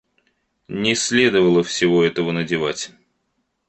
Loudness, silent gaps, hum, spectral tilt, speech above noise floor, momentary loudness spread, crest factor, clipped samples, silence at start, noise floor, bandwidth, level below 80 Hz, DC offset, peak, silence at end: -18 LUFS; none; none; -4 dB/octave; 53 dB; 12 LU; 18 dB; under 0.1%; 0.7 s; -71 dBFS; 8.8 kHz; -56 dBFS; under 0.1%; -2 dBFS; 0.8 s